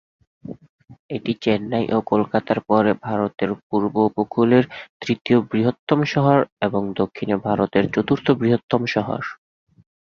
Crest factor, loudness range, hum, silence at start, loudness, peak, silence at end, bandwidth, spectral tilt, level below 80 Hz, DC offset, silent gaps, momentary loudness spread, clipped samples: 18 dB; 2 LU; none; 0.45 s; -20 LUFS; -2 dBFS; 0.75 s; 7 kHz; -8 dB/octave; -54 dBFS; under 0.1%; 0.69-0.79 s, 0.99-1.09 s, 3.63-3.70 s, 4.89-5.00 s, 5.21-5.25 s, 5.79-5.87 s, 6.52-6.57 s, 8.63-8.69 s; 11 LU; under 0.1%